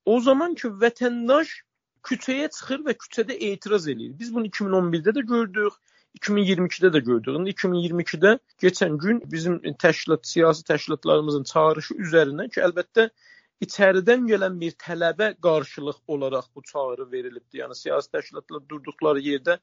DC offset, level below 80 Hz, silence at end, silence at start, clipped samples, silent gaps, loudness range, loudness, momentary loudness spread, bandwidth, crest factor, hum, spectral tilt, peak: under 0.1%; -72 dBFS; 0.05 s; 0.05 s; under 0.1%; none; 6 LU; -23 LUFS; 13 LU; 7.6 kHz; 20 dB; none; -5.5 dB/octave; -2 dBFS